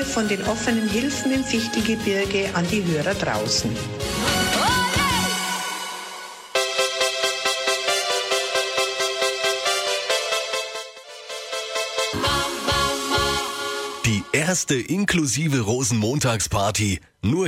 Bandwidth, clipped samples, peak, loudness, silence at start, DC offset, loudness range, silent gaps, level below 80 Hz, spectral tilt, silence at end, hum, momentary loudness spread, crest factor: 16.5 kHz; under 0.1%; -8 dBFS; -22 LUFS; 0 s; under 0.1%; 2 LU; none; -44 dBFS; -3.5 dB/octave; 0 s; none; 7 LU; 16 dB